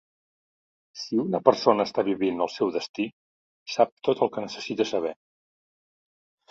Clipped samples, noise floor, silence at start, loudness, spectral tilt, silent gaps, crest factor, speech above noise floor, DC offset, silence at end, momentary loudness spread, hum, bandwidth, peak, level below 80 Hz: under 0.1%; under -90 dBFS; 0.95 s; -26 LUFS; -5.5 dB/octave; 2.89-2.94 s, 3.12-3.66 s, 3.92-3.97 s; 26 dB; over 65 dB; under 0.1%; 1.4 s; 11 LU; none; 7.8 kHz; -2 dBFS; -70 dBFS